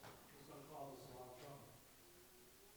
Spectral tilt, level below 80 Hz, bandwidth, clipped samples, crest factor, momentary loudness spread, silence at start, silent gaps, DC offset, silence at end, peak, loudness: -4.5 dB/octave; -78 dBFS; over 20 kHz; under 0.1%; 18 dB; 9 LU; 0 s; none; under 0.1%; 0 s; -40 dBFS; -59 LUFS